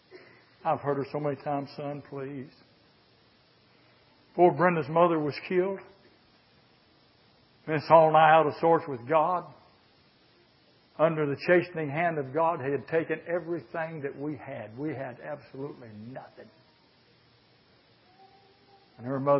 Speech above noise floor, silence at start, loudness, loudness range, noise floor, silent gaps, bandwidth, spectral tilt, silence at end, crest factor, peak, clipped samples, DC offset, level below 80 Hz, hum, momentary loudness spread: 35 dB; 0.15 s; -27 LUFS; 15 LU; -62 dBFS; none; 5.8 kHz; -10.5 dB/octave; 0 s; 24 dB; -6 dBFS; under 0.1%; under 0.1%; -74 dBFS; none; 19 LU